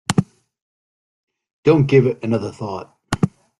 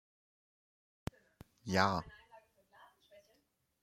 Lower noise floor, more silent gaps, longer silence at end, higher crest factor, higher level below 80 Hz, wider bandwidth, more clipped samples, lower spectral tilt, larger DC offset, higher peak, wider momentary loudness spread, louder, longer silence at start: first, under -90 dBFS vs -78 dBFS; first, 0.62-1.28 s, 1.53-1.63 s vs none; second, 0.3 s vs 1.45 s; second, 20 dB vs 30 dB; first, -50 dBFS vs -66 dBFS; second, 12 kHz vs 15.5 kHz; neither; first, -7 dB/octave vs -5 dB/octave; neither; first, 0 dBFS vs -12 dBFS; second, 15 LU vs 22 LU; first, -19 LUFS vs -36 LUFS; second, 0.1 s vs 1.65 s